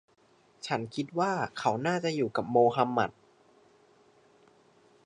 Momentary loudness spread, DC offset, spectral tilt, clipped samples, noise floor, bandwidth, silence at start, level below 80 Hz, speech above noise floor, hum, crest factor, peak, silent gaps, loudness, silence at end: 9 LU; under 0.1%; -6 dB/octave; under 0.1%; -62 dBFS; 10.5 kHz; 0.65 s; -72 dBFS; 34 dB; none; 20 dB; -10 dBFS; none; -29 LUFS; 1.95 s